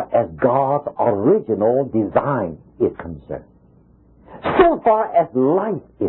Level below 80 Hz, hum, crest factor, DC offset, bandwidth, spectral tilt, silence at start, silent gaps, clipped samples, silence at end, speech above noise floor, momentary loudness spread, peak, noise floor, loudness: -46 dBFS; none; 16 dB; under 0.1%; 4.2 kHz; -12.5 dB/octave; 0 s; none; under 0.1%; 0 s; 33 dB; 14 LU; -2 dBFS; -51 dBFS; -18 LUFS